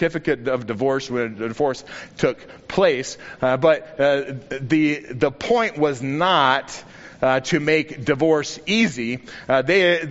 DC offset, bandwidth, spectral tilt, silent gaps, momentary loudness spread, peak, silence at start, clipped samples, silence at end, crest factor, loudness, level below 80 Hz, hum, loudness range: under 0.1%; 8 kHz; -3.5 dB/octave; none; 10 LU; -2 dBFS; 0 s; under 0.1%; 0 s; 18 dB; -20 LUFS; -54 dBFS; none; 2 LU